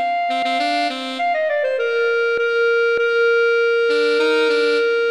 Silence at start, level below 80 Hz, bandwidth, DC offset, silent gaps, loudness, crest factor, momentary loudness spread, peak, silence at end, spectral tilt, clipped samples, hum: 0 s; -68 dBFS; 11 kHz; 0.1%; none; -17 LUFS; 12 dB; 4 LU; -6 dBFS; 0 s; -1.5 dB/octave; under 0.1%; none